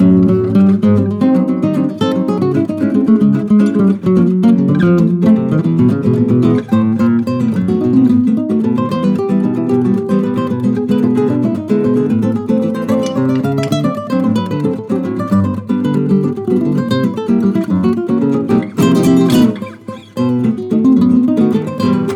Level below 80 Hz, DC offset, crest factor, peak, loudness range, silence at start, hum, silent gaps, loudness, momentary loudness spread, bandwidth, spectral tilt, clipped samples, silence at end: -48 dBFS; under 0.1%; 12 dB; 0 dBFS; 4 LU; 0 s; none; none; -13 LUFS; 5 LU; 14.5 kHz; -8.5 dB/octave; under 0.1%; 0 s